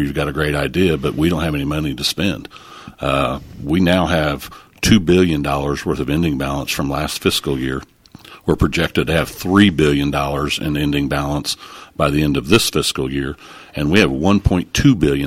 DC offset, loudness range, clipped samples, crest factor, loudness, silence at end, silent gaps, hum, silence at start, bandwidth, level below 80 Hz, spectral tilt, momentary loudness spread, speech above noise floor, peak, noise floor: under 0.1%; 3 LU; under 0.1%; 18 dB; -17 LUFS; 0 s; none; none; 0 s; 16.5 kHz; -32 dBFS; -5 dB/octave; 11 LU; 25 dB; 0 dBFS; -42 dBFS